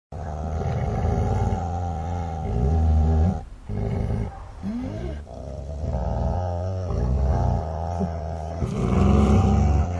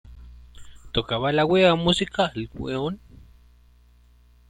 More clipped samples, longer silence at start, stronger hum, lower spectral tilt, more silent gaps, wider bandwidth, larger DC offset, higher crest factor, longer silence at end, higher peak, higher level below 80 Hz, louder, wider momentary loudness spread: neither; about the same, 0.1 s vs 0.05 s; second, none vs 60 Hz at -45 dBFS; first, -8.5 dB/octave vs -5.5 dB/octave; neither; second, 8 kHz vs 11 kHz; neither; about the same, 16 dB vs 20 dB; second, 0 s vs 1.55 s; about the same, -6 dBFS vs -6 dBFS; first, -28 dBFS vs -46 dBFS; about the same, -25 LUFS vs -23 LUFS; about the same, 14 LU vs 13 LU